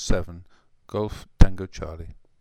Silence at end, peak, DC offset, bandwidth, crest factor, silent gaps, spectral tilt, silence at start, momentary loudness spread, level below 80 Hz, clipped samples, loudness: 0.3 s; 0 dBFS; under 0.1%; 9.2 kHz; 22 dB; none; -6 dB/octave; 0 s; 20 LU; -26 dBFS; under 0.1%; -27 LUFS